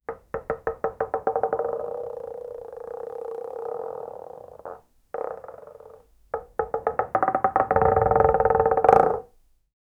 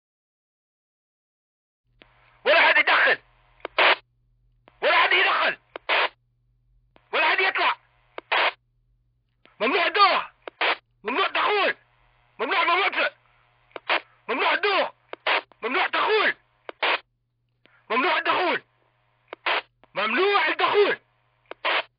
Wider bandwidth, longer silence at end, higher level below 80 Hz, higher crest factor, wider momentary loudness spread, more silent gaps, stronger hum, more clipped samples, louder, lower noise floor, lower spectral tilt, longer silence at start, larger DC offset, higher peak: first, 6.8 kHz vs 5.4 kHz; first, 0.75 s vs 0.15 s; first, -46 dBFS vs -72 dBFS; first, 26 dB vs 18 dB; first, 20 LU vs 12 LU; neither; neither; neither; about the same, -24 LUFS vs -22 LUFS; second, -57 dBFS vs -73 dBFS; first, -8.5 dB/octave vs 2.5 dB/octave; second, 0.1 s vs 2.45 s; neither; first, 0 dBFS vs -6 dBFS